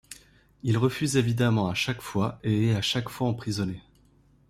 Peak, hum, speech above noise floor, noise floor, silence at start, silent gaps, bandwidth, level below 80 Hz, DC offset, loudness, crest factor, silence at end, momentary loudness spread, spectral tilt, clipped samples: -8 dBFS; none; 34 dB; -60 dBFS; 0.1 s; none; 15.5 kHz; -56 dBFS; under 0.1%; -27 LUFS; 18 dB; 0.7 s; 10 LU; -5.5 dB/octave; under 0.1%